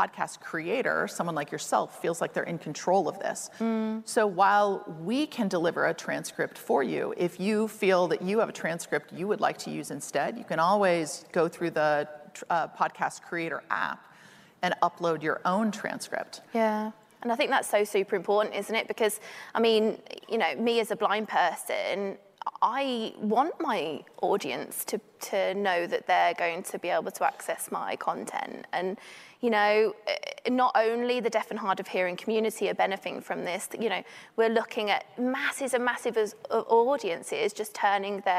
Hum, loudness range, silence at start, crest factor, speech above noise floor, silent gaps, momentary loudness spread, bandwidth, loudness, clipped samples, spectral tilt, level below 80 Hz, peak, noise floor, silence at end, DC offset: none; 3 LU; 0 s; 18 dB; 26 dB; none; 9 LU; 15.5 kHz; -28 LUFS; under 0.1%; -4 dB/octave; -82 dBFS; -10 dBFS; -55 dBFS; 0 s; under 0.1%